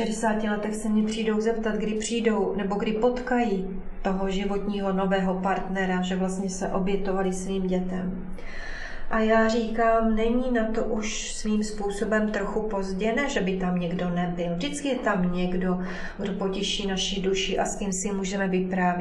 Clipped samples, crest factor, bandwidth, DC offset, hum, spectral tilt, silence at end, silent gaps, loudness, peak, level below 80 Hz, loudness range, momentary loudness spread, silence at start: under 0.1%; 16 dB; 12 kHz; under 0.1%; none; -5 dB/octave; 0 s; none; -26 LUFS; -10 dBFS; -42 dBFS; 2 LU; 6 LU; 0 s